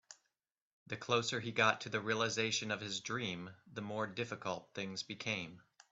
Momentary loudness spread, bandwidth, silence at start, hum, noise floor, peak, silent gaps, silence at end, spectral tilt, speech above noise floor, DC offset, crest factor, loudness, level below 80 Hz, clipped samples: 14 LU; 8.2 kHz; 0.1 s; none; -88 dBFS; -16 dBFS; 0.62-0.86 s; 0.35 s; -3.5 dB/octave; 49 dB; under 0.1%; 24 dB; -38 LUFS; -78 dBFS; under 0.1%